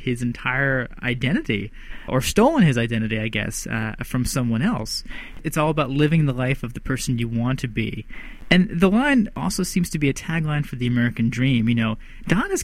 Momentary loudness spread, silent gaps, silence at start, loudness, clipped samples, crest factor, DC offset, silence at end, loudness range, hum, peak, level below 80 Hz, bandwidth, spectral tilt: 9 LU; none; 0 s; -22 LUFS; under 0.1%; 20 dB; under 0.1%; 0 s; 2 LU; none; -2 dBFS; -38 dBFS; 16 kHz; -5.5 dB/octave